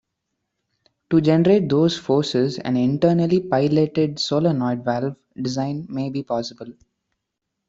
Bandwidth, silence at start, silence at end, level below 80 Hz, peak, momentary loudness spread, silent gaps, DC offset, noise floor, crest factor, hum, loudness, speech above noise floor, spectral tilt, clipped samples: 7.8 kHz; 1.1 s; 0.95 s; -58 dBFS; -4 dBFS; 10 LU; none; under 0.1%; -80 dBFS; 18 dB; none; -20 LUFS; 60 dB; -7 dB/octave; under 0.1%